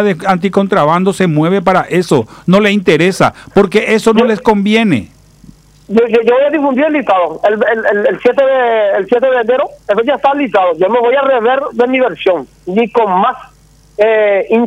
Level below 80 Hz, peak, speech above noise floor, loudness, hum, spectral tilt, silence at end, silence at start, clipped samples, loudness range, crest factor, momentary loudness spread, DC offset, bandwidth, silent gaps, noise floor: -46 dBFS; 0 dBFS; 29 dB; -11 LUFS; none; -6 dB/octave; 0 s; 0 s; under 0.1%; 2 LU; 10 dB; 4 LU; under 0.1%; 14 kHz; none; -40 dBFS